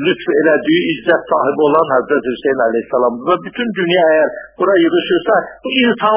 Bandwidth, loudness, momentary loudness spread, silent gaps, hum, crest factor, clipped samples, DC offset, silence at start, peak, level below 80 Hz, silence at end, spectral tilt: 4 kHz; -14 LUFS; 6 LU; none; none; 14 dB; under 0.1%; under 0.1%; 0 s; 0 dBFS; -54 dBFS; 0 s; -9 dB/octave